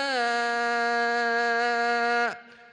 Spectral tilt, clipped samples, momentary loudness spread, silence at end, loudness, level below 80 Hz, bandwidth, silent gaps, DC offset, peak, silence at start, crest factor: -1.5 dB/octave; under 0.1%; 2 LU; 0.1 s; -25 LUFS; -78 dBFS; 10 kHz; none; under 0.1%; -14 dBFS; 0 s; 12 dB